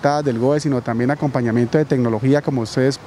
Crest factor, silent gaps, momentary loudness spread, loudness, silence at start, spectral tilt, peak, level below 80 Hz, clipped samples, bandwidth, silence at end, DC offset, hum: 16 dB; none; 3 LU; -18 LUFS; 0 s; -7 dB/octave; -2 dBFS; -54 dBFS; under 0.1%; 12 kHz; 0 s; under 0.1%; none